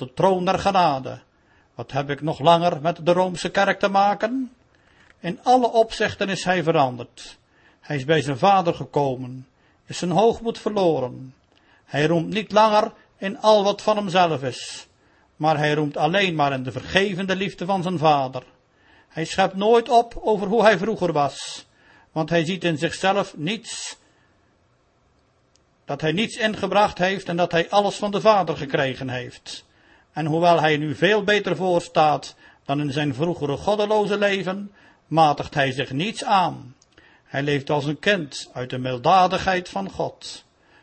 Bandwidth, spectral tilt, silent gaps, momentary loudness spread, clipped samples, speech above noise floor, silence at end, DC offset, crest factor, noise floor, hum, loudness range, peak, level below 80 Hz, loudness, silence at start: 8.8 kHz; -5 dB/octave; none; 15 LU; under 0.1%; 41 dB; 0.45 s; under 0.1%; 20 dB; -62 dBFS; none; 4 LU; -2 dBFS; -54 dBFS; -21 LUFS; 0 s